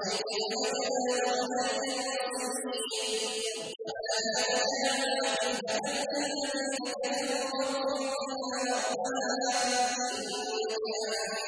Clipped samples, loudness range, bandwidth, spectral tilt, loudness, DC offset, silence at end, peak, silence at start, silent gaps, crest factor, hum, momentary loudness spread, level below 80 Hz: under 0.1%; 2 LU; 11 kHz; -1 dB/octave; -31 LUFS; under 0.1%; 0 s; -16 dBFS; 0 s; none; 16 dB; none; 5 LU; -76 dBFS